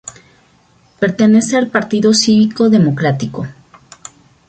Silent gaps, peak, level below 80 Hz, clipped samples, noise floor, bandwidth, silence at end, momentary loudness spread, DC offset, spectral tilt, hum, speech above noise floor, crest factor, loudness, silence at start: none; 0 dBFS; -52 dBFS; under 0.1%; -51 dBFS; 9.2 kHz; 0.95 s; 14 LU; under 0.1%; -5 dB/octave; none; 39 dB; 14 dB; -13 LUFS; 0.05 s